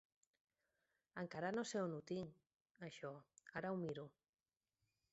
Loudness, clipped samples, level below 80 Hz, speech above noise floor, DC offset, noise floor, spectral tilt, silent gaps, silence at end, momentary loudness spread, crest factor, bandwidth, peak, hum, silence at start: -48 LUFS; under 0.1%; -84 dBFS; over 43 dB; under 0.1%; under -90 dBFS; -5 dB/octave; 2.55-2.65 s, 2.71-2.75 s; 1.05 s; 14 LU; 18 dB; 7.6 kHz; -32 dBFS; none; 1.15 s